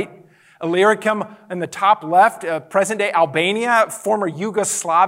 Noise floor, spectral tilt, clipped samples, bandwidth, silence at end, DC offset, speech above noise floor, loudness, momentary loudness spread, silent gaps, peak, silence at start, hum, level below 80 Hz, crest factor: -47 dBFS; -3.5 dB/octave; under 0.1%; 16 kHz; 0 s; under 0.1%; 29 dB; -18 LUFS; 12 LU; none; -2 dBFS; 0 s; none; -74 dBFS; 16 dB